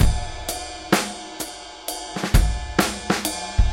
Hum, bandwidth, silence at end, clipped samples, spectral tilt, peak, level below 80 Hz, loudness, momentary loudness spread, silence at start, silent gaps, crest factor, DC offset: none; 17 kHz; 0 s; under 0.1%; -4 dB/octave; 0 dBFS; -24 dBFS; -24 LUFS; 10 LU; 0 s; none; 22 dB; under 0.1%